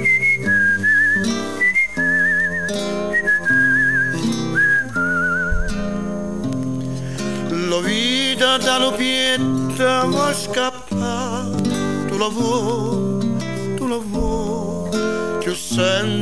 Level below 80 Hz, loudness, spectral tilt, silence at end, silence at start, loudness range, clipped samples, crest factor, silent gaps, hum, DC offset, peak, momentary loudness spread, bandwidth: -36 dBFS; -18 LUFS; -4 dB/octave; 0 s; 0 s; 5 LU; under 0.1%; 16 dB; none; none; 2%; -4 dBFS; 10 LU; 11 kHz